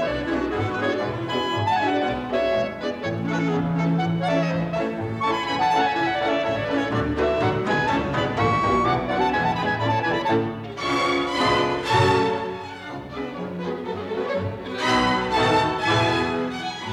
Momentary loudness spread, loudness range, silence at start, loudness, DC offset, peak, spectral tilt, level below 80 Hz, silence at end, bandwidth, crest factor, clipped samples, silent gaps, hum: 9 LU; 2 LU; 0 s; -23 LUFS; under 0.1%; -6 dBFS; -5.5 dB/octave; -46 dBFS; 0 s; 13 kHz; 16 dB; under 0.1%; none; none